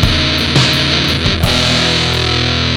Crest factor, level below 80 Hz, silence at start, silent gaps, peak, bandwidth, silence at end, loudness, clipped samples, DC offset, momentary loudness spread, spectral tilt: 12 dB; -24 dBFS; 0 s; none; 0 dBFS; 17.5 kHz; 0 s; -11 LUFS; under 0.1%; under 0.1%; 2 LU; -4 dB/octave